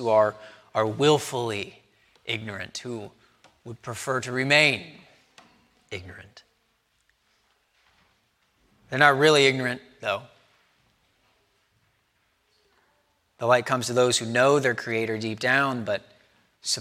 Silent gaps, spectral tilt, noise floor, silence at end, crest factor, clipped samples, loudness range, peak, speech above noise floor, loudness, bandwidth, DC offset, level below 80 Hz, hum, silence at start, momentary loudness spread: none; -3.5 dB/octave; -70 dBFS; 0 s; 26 dB; under 0.1%; 9 LU; -2 dBFS; 46 dB; -23 LUFS; 16 kHz; under 0.1%; -70 dBFS; none; 0 s; 21 LU